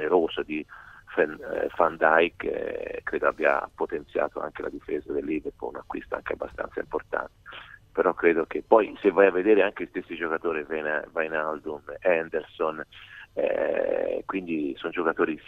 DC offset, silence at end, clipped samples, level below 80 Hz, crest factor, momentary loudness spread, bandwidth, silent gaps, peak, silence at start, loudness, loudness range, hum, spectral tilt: under 0.1%; 0.05 s; under 0.1%; -58 dBFS; 22 dB; 14 LU; 6.2 kHz; none; -4 dBFS; 0 s; -27 LUFS; 8 LU; none; -7 dB/octave